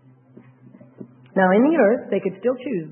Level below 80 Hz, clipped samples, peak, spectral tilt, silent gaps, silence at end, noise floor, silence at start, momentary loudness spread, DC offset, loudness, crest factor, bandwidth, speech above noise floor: -72 dBFS; under 0.1%; -4 dBFS; -12 dB/octave; none; 0 s; -49 dBFS; 1 s; 10 LU; under 0.1%; -20 LUFS; 16 dB; 3.3 kHz; 30 dB